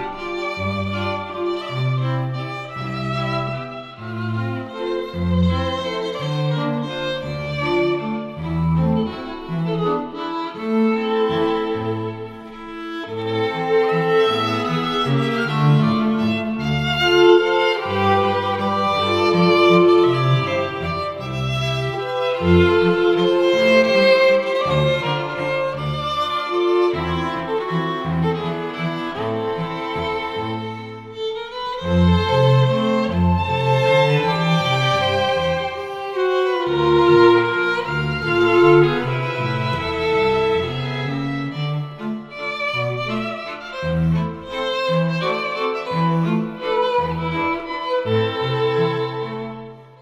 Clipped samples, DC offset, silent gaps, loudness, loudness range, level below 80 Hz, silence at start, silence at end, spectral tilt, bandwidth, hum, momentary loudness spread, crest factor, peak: under 0.1%; under 0.1%; none; -19 LUFS; 7 LU; -42 dBFS; 0 s; 0.15 s; -7 dB/octave; 11.5 kHz; none; 12 LU; 18 dB; -2 dBFS